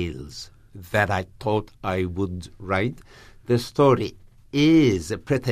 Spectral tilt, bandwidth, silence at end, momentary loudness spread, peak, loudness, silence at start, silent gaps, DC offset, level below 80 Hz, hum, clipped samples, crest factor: -6.5 dB/octave; 15 kHz; 0 s; 18 LU; -6 dBFS; -23 LUFS; 0 s; none; under 0.1%; -48 dBFS; none; under 0.1%; 18 dB